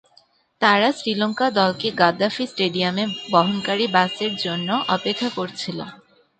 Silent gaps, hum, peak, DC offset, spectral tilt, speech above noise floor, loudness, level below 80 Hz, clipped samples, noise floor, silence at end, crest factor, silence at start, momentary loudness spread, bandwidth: none; none; -2 dBFS; under 0.1%; -5 dB/octave; 37 dB; -21 LUFS; -66 dBFS; under 0.1%; -58 dBFS; 0.45 s; 20 dB; 0.6 s; 8 LU; 9.2 kHz